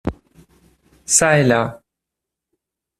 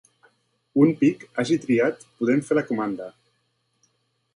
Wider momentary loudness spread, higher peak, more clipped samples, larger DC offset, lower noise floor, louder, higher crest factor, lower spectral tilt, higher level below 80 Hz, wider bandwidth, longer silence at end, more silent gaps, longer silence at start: first, 17 LU vs 10 LU; first, 0 dBFS vs -4 dBFS; neither; neither; first, -83 dBFS vs -71 dBFS; first, -15 LUFS vs -23 LUFS; about the same, 20 dB vs 20 dB; second, -3.5 dB/octave vs -7 dB/octave; first, -46 dBFS vs -68 dBFS; first, 14.5 kHz vs 11 kHz; about the same, 1.25 s vs 1.25 s; neither; second, 0.05 s vs 0.75 s